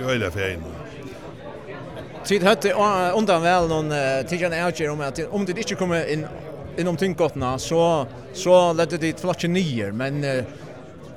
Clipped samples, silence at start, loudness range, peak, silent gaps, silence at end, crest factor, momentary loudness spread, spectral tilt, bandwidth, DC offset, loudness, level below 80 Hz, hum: under 0.1%; 0 s; 4 LU; -4 dBFS; none; 0 s; 18 dB; 18 LU; -5 dB/octave; 15.5 kHz; 0.3%; -22 LUFS; -50 dBFS; none